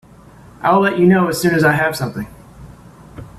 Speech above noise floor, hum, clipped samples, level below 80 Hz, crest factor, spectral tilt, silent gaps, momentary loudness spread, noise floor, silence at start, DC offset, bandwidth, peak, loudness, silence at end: 28 dB; none; under 0.1%; -48 dBFS; 16 dB; -6 dB/octave; none; 13 LU; -42 dBFS; 0.6 s; under 0.1%; 15 kHz; -2 dBFS; -15 LUFS; 0.1 s